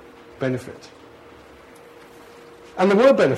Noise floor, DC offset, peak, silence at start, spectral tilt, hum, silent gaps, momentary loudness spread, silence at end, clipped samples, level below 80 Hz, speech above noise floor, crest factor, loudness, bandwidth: -46 dBFS; under 0.1%; -4 dBFS; 0.4 s; -6.5 dB/octave; none; none; 24 LU; 0 s; under 0.1%; -60 dBFS; 28 dB; 18 dB; -19 LUFS; 12 kHz